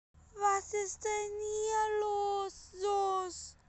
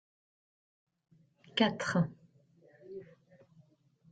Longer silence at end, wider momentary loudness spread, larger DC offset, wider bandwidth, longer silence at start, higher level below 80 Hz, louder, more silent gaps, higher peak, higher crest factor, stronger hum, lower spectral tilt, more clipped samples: second, 0.15 s vs 1.1 s; second, 6 LU vs 20 LU; neither; about the same, 8.8 kHz vs 9 kHz; second, 0.35 s vs 1.55 s; first, -64 dBFS vs -74 dBFS; about the same, -34 LUFS vs -32 LUFS; neither; second, -18 dBFS vs -14 dBFS; second, 16 dB vs 24 dB; neither; second, -2 dB/octave vs -5.5 dB/octave; neither